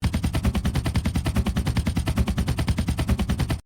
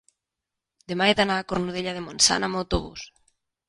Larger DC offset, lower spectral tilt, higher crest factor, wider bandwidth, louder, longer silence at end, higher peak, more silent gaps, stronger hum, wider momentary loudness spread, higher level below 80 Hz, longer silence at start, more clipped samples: neither; first, -6 dB/octave vs -2.5 dB/octave; second, 12 dB vs 22 dB; first, 17.5 kHz vs 11.5 kHz; about the same, -25 LUFS vs -23 LUFS; second, 0.05 s vs 0.65 s; second, -12 dBFS vs -4 dBFS; neither; neither; second, 1 LU vs 17 LU; first, -28 dBFS vs -44 dBFS; second, 0 s vs 0.9 s; neither